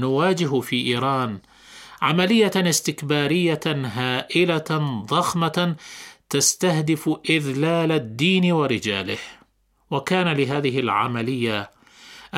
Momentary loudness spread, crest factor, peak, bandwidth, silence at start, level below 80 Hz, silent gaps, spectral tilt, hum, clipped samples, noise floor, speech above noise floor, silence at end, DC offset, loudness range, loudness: 11 LU; 18 dB; -4 dBFS; 16.5 kHz; 0 s; -62 dBFS; none; -4.5 dB/octave; none; under 0.1%; -61 dBFS; 39 dB; 0 s; under 0.1%; 2 LU; -21 LUFS